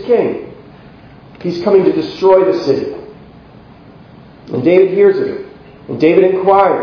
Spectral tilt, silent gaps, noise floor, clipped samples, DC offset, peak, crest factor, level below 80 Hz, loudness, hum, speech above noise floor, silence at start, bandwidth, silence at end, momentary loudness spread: -8 dB/octave; none; -39 dBFS; 0.1%; under 0.1%; 0 dBFS; 14 dB; -50 dBFS; -12 LUFS; none; 28 dB; 0 s; 5.4 kHz; 0 s; 17 LU